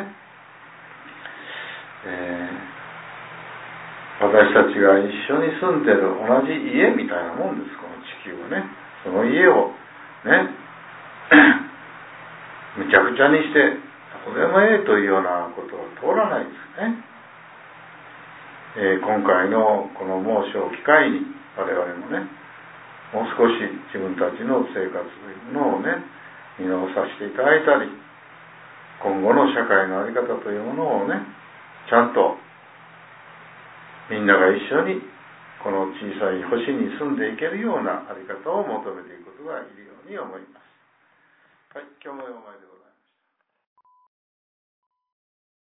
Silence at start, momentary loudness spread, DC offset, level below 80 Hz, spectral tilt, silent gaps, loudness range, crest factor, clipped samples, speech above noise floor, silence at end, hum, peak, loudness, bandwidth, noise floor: 0 s; 23 LU; under 0.1%; -68 dBFS; -9 dB/octave; none; 12 LU; 22 dB; under 0.1%; 54 dB; 3.1 s; none; 0 dBFS; -20 LUFS; 4 kHz; -74 dBFS